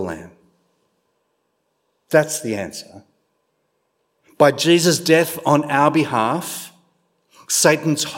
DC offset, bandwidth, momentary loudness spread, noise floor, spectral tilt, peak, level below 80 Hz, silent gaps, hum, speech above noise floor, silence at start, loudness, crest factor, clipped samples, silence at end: under 0.1%; 16.5 kHz; 16 LU; -70 dBFS; -4 dB/octave; 0 dBFS; -64 dBFS; none; none; 52 dB; 0 s; -17 LUFS; 20 dB; under 0.1%; 0 s